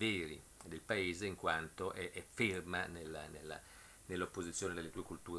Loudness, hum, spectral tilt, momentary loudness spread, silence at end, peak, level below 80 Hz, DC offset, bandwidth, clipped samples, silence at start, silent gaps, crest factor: -42 LUFS; none; -4 dB/octave; 14 LU; 0 s; -20 dBFS; -64 dBFS; under 0.1%; 11 kHz; under 0.1%; 0 s; none; 22 dB